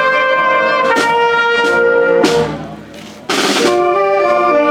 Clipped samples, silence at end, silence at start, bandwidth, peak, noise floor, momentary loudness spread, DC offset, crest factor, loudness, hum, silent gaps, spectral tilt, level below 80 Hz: under 0.1%; 0 s; 0 s; 16.5 kHz; 0 dBFS; -32 dBFS; 13 LU; under 0.1%; 12 dB; -12 LUFS; none; none; -3.5 dB/octave; -48 dBFS